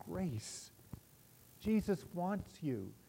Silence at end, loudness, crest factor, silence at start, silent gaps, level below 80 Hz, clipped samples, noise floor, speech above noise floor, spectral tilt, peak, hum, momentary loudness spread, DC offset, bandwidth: 0.1 s; -40 LUFS; 16 dB; 0 s; none; -62 dBFS; under 0.1%; -64 dBFS; 24 dB; -6.5 dB/octave; -24 dBFS; none; 20 LU; under 0.1%; 16 kHz